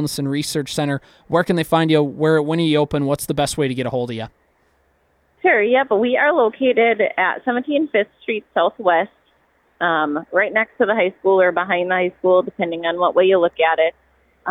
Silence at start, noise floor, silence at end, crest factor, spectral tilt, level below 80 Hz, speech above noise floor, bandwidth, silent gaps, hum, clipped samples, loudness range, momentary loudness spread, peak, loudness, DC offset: 0 s; -61 dBFS; 0 s; 16 dB; -5.5 dB/octave; -54 dBFS; 43 dB; 16 kHz; none; none; under 0.1%; 3 LU; 7 LU; -2 dBFS; -18 LUFS; under 0.1%